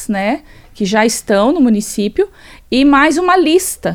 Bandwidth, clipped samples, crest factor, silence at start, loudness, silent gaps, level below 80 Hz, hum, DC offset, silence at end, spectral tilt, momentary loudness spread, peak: 18.5 kHz; under 0.1%; 14 dB; 0 s; -13 LUFS; none; -40 dBFS; none; under 0.1%; 0 s; -4 dB/octave; 9 LU; 0 dBFS